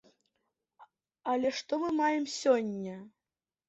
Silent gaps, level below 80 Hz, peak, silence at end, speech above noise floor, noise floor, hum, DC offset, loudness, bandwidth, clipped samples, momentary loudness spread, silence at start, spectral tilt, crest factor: none; -74 dBFS; -14 dBFS; 0.6 s; over 59 dB; under -90 dBFS; none; under 0.1%; -31 LUFS; 8.2 kHz; under 0.1%; 13 LU; 0.8 s; -4.5 dB/octave; 20 dB